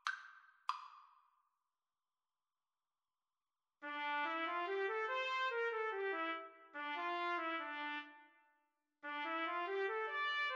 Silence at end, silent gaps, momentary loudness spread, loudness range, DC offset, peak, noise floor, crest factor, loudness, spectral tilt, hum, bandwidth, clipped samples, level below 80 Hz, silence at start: 0 s; none; 13 LU; 14 LU; under 0.1%; -24 dBFS; under -90 dBFS; 20 dB; -41 LUFS; -0.5 dB/octave; none; 9.4 kHz; under 0.1%; under -90 dBFS; 0.05 s